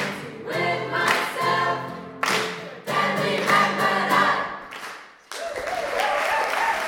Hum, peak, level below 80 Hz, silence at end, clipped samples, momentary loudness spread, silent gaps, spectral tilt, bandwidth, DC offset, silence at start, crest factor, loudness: none; -4 dBFS; -62 dBFS; 0 s; under 0.1%; 15 LU; none; -3.5 dB/octave; 19 kHz; under 0.1%; 0 s; 20 dB; -23 LUFS